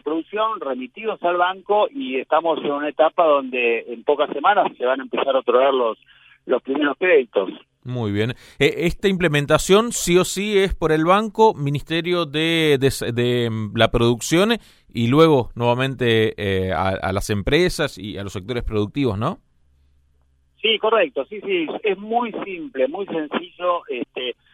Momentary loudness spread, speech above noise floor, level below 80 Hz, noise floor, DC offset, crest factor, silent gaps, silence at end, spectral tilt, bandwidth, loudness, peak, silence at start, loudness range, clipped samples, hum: 10 LU; 41 dB; -42 dBFS; -60 dBFS; under 0.1%; 20 dB; none; 0.2 s; -5 dB/octave; 16 kHz; -20 LUFS; 0 dBFS; 0.05 s; 5 LU; under 0.1%; none